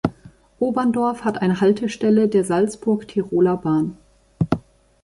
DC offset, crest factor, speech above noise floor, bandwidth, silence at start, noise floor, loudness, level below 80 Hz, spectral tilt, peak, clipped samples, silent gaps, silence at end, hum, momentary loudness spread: under 0.1%; 18 dB; 28 dB; 11.5 kHz; 0.05 s; -47 dBFS; -20 LUFS; -50 dBFS; -7 dB/octave; -2 dBFS; under 0.1%; none; 0.45 s; none; 7 LU